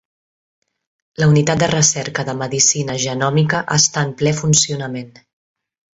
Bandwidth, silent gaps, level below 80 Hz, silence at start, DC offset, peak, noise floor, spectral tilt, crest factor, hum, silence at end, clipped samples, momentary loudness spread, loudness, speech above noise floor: 8.2 kHz; none; -50 dBFS; 1.2 s; under 0.1%; 0 dBFS; under -90 dBFS; -3.5 dB/octave; 18 dB; none; 0.85 s; under 0.1%; 9 LU; -16 LUFS; over 74 dB